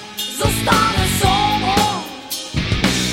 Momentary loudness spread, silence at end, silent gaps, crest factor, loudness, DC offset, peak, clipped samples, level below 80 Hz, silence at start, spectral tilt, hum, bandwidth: 10 LU; 0 s; none; 16 dB; -17 LUFS; under 0.1%; -2 dBFS; under 0.1%; -30 dBFS; 0 s; -3.5 dB/octave; none; 17 kHz